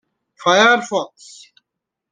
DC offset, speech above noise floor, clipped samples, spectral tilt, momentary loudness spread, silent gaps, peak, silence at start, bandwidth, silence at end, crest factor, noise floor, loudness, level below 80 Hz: under 0.1%; 65 dB; under 0.1%; -2.5 dB/octave; 13 LU; none; -2 dBFS; 0.45 s; 10 kHz; 1.05 s; 18 dB; -81 dBFS; -15 LUFS; -70 dBFS